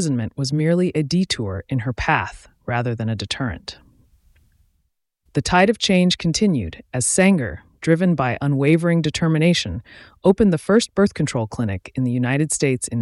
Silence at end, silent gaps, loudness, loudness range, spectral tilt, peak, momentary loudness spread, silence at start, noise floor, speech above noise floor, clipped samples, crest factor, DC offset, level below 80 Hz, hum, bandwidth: 0 s; none; -20 LUFS; 7 LU; -5 dB/octave; -2 dBFS; 10 LU; 0 s; -71 dBFS; 51 dB; under 0.1%; 18 dB; under 0.1%; -44 dBFS; none; 12 kHz